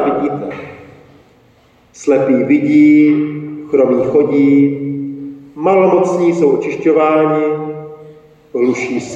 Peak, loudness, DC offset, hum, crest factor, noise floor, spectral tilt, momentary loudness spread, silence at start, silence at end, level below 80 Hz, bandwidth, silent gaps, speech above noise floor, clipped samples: -2 dBFS; -13 LUFS; under 0.1%; none; 12 dB; -49 dBFS; -7.5 dB/octave; 16 LU; 0 s; 0 s; -56 dBFS; 7.8 kHz; none; 38 dB; under 0.1%